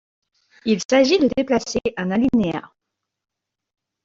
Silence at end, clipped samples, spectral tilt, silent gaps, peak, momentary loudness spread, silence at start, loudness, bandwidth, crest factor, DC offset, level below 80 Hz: 1.4 s; under 0.1%; -5 dB/octave; 0.85-0.89 s; -2 dBFS; 9 LU; 0.65 s; -19 LUFS; 8 kHz; 20 dB; under 0.1%; -52 dBFS